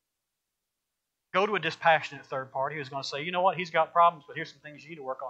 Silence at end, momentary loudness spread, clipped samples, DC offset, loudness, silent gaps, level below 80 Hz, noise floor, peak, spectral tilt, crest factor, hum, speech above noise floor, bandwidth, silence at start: 0 s; 15 LU; under 0.1%; under 0.1%; -27 LUFS; none; -80 dBFS; -85 dBFS; -10 dBFS; -4.5 dB/octave; 20 dB; none; 57 dB; 8.4 kHz; 1.35 s